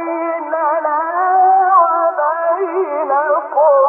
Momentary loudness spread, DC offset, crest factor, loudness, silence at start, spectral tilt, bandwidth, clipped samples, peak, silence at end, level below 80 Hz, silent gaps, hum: 7 LU; under 0.1%; 12 dB; -14 LUFS; 0 s; -6.5 dB/octave; 2.9 kHz; under 0.1%; -2 dBFS; 0 s; -82 dBFS; none; none